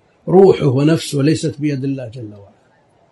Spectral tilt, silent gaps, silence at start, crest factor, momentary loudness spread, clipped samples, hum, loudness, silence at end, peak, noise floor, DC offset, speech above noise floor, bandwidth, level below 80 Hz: -7 dB/octave; none; 0.25 s; 16 dB; 19 LU; under 0.1%; none; -15 LUFS; 0.7 s; 0 dBFS; -54 dBFS; under 0.1%; 40 dB; 12 kHz; -52 dBFS